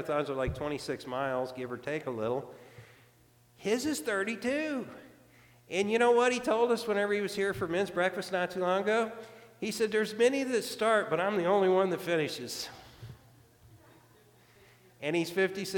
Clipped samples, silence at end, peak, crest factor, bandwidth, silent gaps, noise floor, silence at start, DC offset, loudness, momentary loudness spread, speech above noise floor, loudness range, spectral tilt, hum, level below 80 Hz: under 0.1%; 0 s; -14 dBFS; 18 dB; 19 kHz; none; -63 dBFS; 0 s; under 0.1%; -31 LUFS; 12 LU; 33 dB; 8 LU; -4.5 dB/octave; none; -60 dBFS